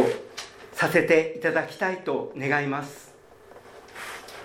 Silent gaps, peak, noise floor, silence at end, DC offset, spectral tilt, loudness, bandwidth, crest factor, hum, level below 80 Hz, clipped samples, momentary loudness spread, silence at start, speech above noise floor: none; -6 dBFS; -50 dBFS; 0 s; under 0.1%; -5 dB/octave; -25 LUFS; 17 kHz; 22 dB; none; -66 dBFS; under 0.1%; 18 LU; 0 s; 25 dB